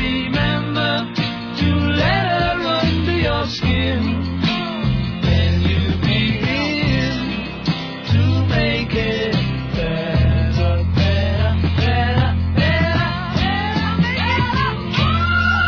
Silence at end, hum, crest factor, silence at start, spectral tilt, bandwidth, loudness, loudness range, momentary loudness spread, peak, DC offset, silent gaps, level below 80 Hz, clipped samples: 0 s; none; 14 dB; 0 s; -7 dB/octave; 5.4 kHz; -18 LUFS; 1 LU; 4 LU; -4 dBFS; under 0.1%; none; -28 dBFS; under 0.1%